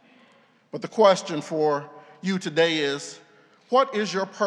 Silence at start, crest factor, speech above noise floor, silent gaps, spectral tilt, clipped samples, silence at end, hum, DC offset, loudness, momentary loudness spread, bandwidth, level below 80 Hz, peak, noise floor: 0.75 s; 22 dB; 35 dB; none; -4.5 dB/octave; under 0.1%; 0 s; none; under 0.1%; -24 LUFS; 16 LU; 11 kHz; -88 dBFS; -4 dBFS; -58 dBFS